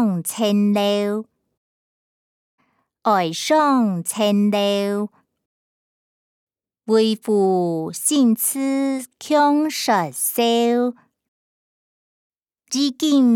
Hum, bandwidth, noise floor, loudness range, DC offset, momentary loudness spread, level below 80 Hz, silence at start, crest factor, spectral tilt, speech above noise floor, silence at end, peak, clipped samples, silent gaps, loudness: none; 19 kHz; under -90 dBFS; 4 LU; under 0.1%; 8 LU; -78 dBFS; 0 s; 16 dB; -4.5 dB/octave; over 72 dB; 0 s; -4 dBFS; under 0.1%; 1.57-2.58 s, 5.46-6.47 s, 11.28-12.30 s, 12.36-12.46 s; -19 LUFS